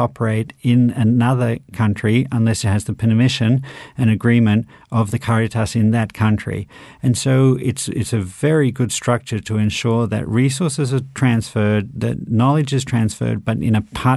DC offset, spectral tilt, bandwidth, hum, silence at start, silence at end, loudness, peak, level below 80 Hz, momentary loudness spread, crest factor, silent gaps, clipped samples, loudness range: under 0.1%; -6.5 dB/octave; 12.5 kHz; none; 0 s; 0 s; -18 LUFS; -2 dBFS; -46 dBFS; 7 LU; 16 dB; none; under 0.1%; 2 LU